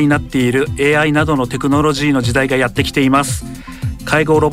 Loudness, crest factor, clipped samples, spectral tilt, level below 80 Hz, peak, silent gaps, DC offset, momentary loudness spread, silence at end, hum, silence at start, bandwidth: -14 LUFS; 12 dB; under 0.1%; -5.5 dB/octave; -32 dBFS; -2 dBFS; none; under 0.1%; 11 LU; 0 s; none; 0 s; 16 kHz